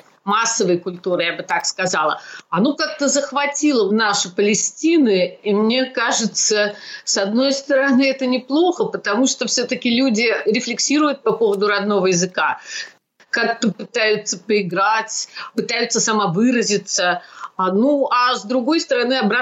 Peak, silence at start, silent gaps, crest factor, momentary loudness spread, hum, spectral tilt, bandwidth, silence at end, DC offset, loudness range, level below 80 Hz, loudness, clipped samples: -8 dBFS; 0.25 s; none; 10 dB; 6 LU; none; -3 dB/octave; 8.4 kHz; 0 s; under 0.1%; 2 LU; -74 dBFS; -18 LUFS; under 0.1%